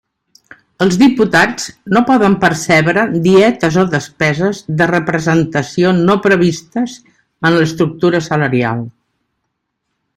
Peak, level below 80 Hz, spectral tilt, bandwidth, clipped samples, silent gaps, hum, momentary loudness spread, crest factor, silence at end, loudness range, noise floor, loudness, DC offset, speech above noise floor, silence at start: 0 dBFS; -48 dBFS; -6 dB/octave; 14.5 kHz; under 0.1%; none; none; 7 LU; 14 dB; 1.25 s; 4 LU; -71 dBFS; -13 LUFS; under 0.1%; 59 dB; 0.8 s